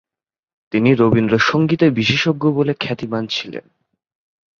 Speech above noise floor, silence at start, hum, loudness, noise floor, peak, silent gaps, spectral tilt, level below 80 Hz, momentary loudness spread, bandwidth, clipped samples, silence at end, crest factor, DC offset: 74 dB; 0.75 s; none; -16 LUFS; -90 dBFS; 0 dBFS; none; -6.5 dB/octave; -52 dBFS; 9 LU; 7.2 kHz; under 0.1%; 1 s; 18 dB; under 0.1%